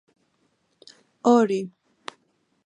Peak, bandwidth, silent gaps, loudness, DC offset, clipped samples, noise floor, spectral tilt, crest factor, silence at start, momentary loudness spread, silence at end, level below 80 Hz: -6 dBFS; 9.8 kHz; none; -21 LUFS; under 0.1%; under 0.1%; -69 dBFS; -6 dB/octave; 22 dB; 1.25 s; 23 LU; 1 s; -78 dBFS